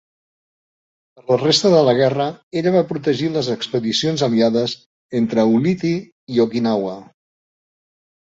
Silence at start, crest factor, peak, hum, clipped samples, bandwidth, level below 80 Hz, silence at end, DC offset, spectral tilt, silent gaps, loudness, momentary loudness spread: 1.3 s; 18 dB; -2 dBFS; none; under 0.1%; 8 kHz; -60 dBFS; 1.35 s; under 0.1%; -5.5 dB/octave; 2.43-2.51 s, 4.86-5.09 s, 6.12-6.27 s; -18 LUFS; 11 LU